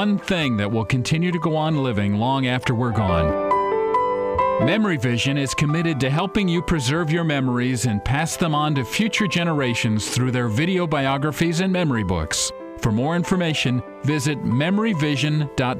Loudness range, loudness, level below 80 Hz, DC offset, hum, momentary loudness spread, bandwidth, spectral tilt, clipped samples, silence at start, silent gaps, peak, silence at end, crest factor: 1 LU; -21 LUFS; -42 dBFS; under 0.1%; none; 2 LU; 15.5 kHz; -5.5 dB/octave; under 0.1%; 0 s; none; -10 dBFS; 0 s; 12 dB